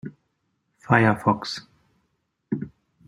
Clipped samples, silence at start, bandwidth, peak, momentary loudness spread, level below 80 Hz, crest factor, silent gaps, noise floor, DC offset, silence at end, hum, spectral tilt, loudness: under 0.1%; 0.05 s; 12 kHz; -2 dBFS; 19 LU; -62 dBFS; 24 dB; none; -74 dBFS; under 0.1%; 0.4 s; none; -6.5 dB/octave; -23 LUFS